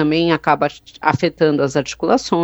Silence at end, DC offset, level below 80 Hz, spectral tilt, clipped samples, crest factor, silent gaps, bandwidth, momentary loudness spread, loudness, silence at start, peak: 0 s; under 0.1%; -50 dBFS; -5.5 dB/octave; under 0.1%; 16 dB; none; over 20 kHz; 4 LU; -17 LUFS; 0 s; 0 dBFS